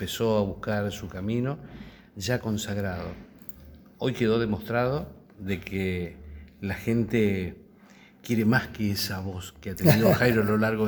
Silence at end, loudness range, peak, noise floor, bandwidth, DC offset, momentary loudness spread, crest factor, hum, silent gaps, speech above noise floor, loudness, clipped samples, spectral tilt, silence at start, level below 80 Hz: 0 s; 6 LU; 0 dBFS; -53 dBFS; over 20 kHz; under 0.1%; 20 LU; 26 dB; none; none; 27 dB; -27 LUFS; under 0.1%; -6 dB/octave; 0 s; -50 dBFS